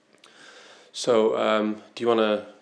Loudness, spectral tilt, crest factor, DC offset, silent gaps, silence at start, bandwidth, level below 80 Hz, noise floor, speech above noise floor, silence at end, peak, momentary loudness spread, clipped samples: -24 LUFS; -4.5 dB/octave; 18 dB; under 0.1%; none; 0.95 s; 11 kHz; -88 dBFS; -52 dBFS; 29 dB; 0.1 s; -8 dBFS; 9 LU; under 0.1%